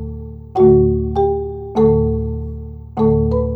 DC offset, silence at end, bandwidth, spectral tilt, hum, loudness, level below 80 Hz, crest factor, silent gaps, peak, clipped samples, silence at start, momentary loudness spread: under 0.1%; 0 s; 5.6 kHz; -11.5 dB/octave; none; -16 LUFS; -28 dBFS; 14 dB; none; -2 dBFS; under 0.1%; 0 s; 17 LU